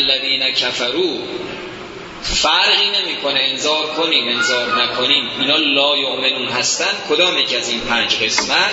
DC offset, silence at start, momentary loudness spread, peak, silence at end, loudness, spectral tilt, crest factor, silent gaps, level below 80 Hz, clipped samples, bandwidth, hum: under 0.1%; 0 s; 11 LU; 0 dBFS; 0 s; -15 LUFS; -1 dB/octave; 16 dB; none; -44 dBFS; under 0.1%; 8 kHz; none